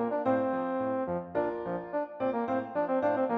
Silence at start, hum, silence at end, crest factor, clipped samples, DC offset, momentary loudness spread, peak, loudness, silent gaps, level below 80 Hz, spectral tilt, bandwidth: 0 s; none; 0 s; 16 dB; under 0.1%; under 0.1%; 6 LU; -14 dBFS; -31 LUFS; none; -66 dBFS; -9 dB/octave; 5 kHz